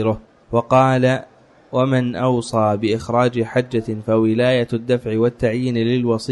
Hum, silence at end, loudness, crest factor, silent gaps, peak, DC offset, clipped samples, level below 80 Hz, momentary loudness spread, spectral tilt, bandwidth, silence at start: none; 0 s; -18 LUFS; 14 dB; none; -4 dBFS; under 0.1%; under 0.1%; -50 dBFS; 7 LU; -7 dB/octave; 11 kHz; 0 s